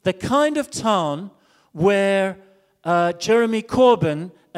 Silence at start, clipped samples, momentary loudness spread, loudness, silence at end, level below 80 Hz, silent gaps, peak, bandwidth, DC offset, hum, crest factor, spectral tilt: 0.05 s; under 0.1%; 12 LU; -19 LUFS; 0 s; -54 dBFS; none; -4 dBFS; 14.5 kHz; under 0.1%; none; 16 dB; -5.5 dB/octave